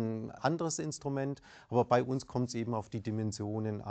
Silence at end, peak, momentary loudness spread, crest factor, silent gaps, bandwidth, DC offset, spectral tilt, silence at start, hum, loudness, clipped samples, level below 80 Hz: 0 s; -12 dBFS; 8 LU; 22 dB; none; 9 kHz; under 0.1%; -6 dB/octave; 0 s; none; -35 LUFS; under 0.1%; -66 dBFS